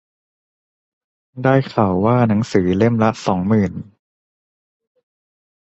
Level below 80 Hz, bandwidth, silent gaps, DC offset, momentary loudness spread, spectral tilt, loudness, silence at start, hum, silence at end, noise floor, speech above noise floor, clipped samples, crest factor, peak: -46 dBFS; 8.2 kHz; none; under 0.1%; 5 LU; -8 dB/octave; -17 LUFS; 1.35 s; none; 1.8 s; under -90 dBFS; over 74 dB; under 0.1%; 18 dB; -2 dBFS